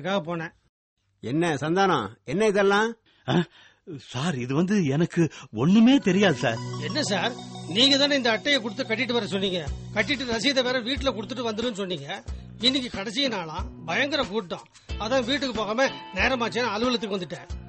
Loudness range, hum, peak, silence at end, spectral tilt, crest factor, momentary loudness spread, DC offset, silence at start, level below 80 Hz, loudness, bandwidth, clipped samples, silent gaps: 5 LU; none; -8 dBFS; 0 s; -4.5 dB/octave; 16 dB; 14 LU; under 0.1%; 0 s; -46 dBFS; -24 LUFS; 8.8 kHz; under 0.1%; 0.69-0.97 s